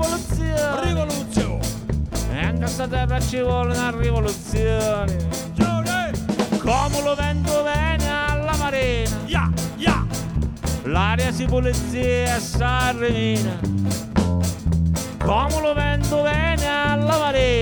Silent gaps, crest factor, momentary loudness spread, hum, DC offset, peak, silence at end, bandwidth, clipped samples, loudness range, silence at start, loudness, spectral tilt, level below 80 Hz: none; 16 dB; 4 LU; none; under 0.1%; -4 dBFS; 0 s; over 20 kHz; under 0.1%; 2 LU; 0 s; -21 LUFS; -5.5 dB/octave; -28 dBFS